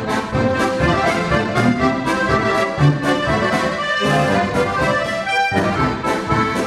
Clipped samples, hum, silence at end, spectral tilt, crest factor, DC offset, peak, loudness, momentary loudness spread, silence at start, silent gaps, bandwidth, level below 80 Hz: under 0.1%; none; 0 s; -5.5 dB/octave; 14 dB; under 0.1%; -2 dBFS; -17 LUFS; 3 LU; 0 s; none; 13.5 kHz; -36 dBFS